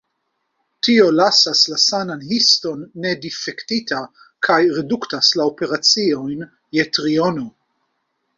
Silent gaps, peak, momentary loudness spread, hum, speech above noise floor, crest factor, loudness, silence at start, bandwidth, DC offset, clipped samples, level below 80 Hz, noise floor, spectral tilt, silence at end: none; -2 dBFS; 13 LU; none; 55 dB; 18 dB; -16 LUFS; 0.85 s; 7.8 kHz; under 0.1%; under 0.1%; -62 dBFS; -72 dBFS; -3 dB/octave; 0.9 s